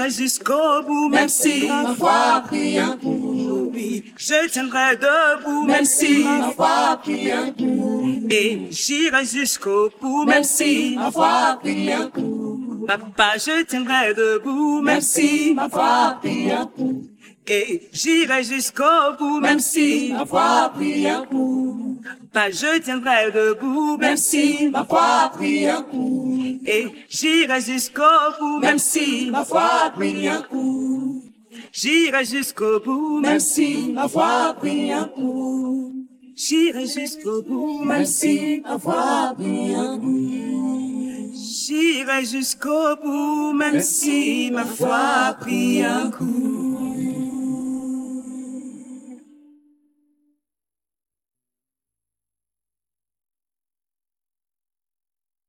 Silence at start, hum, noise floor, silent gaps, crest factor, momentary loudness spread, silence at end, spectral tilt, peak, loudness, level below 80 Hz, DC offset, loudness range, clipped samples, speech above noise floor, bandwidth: 0 s; none; under -90 dBFS; none; 18 dB; 9 LU; 6.3 s; -2.5 dB/octave; -2 dBFS; -19 LUFS; -68 dBFS; under 0.1%; 5 LU; under 0.1%; over 71 dB; 18 kHz